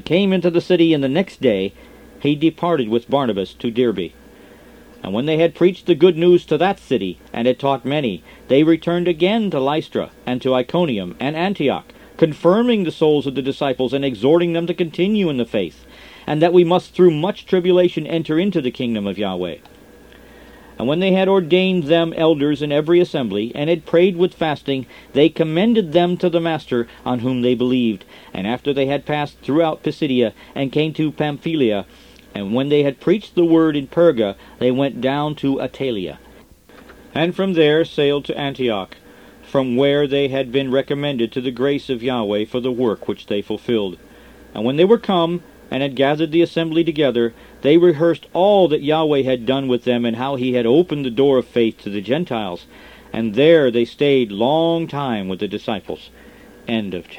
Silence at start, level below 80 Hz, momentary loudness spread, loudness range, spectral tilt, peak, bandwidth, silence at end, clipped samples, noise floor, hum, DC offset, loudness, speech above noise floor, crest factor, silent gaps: 0.05 s; -52 dBFS; 10 LU; 4 LU; -7.5 dB/octave; 0 dBFS; 9.6 kHz; 0 s; under 0.1%; -46 dBFS; none; under 0.1%; -18 LUFS; 28 dB; 18 dB; none